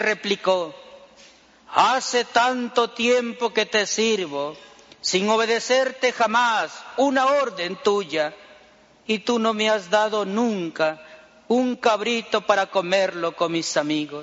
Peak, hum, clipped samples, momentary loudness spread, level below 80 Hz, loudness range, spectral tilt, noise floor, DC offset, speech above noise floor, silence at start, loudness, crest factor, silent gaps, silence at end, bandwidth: -2 dBFS; none; under 0.1%; 6 LU; -70 dBFS; 2 LU; -1.5 dB/octave; -53 dBFS; under 0.1%; 31 dB; 0 s; -22 LUFS; 20 dB; none; 0 s; 8 kHz